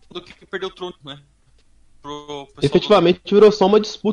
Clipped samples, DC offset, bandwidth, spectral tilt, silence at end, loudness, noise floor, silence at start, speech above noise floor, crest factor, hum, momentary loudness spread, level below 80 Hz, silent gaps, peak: under 0.1%; under 0.1%; 10 kHz; -6 dB/octave; 0 s; -15 LUFS; -53 dBFS; 0.15 s; 35 dB; 16 dB; none; 23 LU; -52 dBFS; none; -2 dBFS